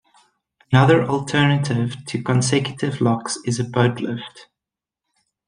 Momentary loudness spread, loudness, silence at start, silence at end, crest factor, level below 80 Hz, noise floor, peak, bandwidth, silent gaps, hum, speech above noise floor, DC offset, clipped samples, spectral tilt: 11 LU; -20 LUFS; 0.7 s; 1.05 s; 18 dB; -58 dBFS; -87 dBFS; -2 dBFS; 10.5 kHz; none; none; 68 dB; under 0.1%; under 0.1%; -5.5 dB/octave